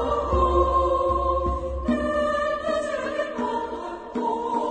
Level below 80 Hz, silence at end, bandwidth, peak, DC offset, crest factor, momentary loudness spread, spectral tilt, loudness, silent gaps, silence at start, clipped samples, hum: -34 dBFS; 0 s; 9.2 kHz; -8 dBFS; under 0.1%; 16 dB; 8 LU; -6.5 dB/octave; -24 LUFS; none; 0 s; under 0.1%; none